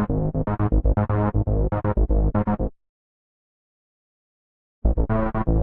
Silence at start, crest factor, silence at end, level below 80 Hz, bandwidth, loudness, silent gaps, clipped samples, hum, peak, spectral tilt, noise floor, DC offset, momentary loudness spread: 0 s; 16 dB; 0 s; -26 dBFS; 3.2 kHz; -23 LUFS; 2.89-4.82 s; under 0.1%; none; -6 dBFS; -13 dB/octave; under -90 dBFS; under 0.1%; 4 LU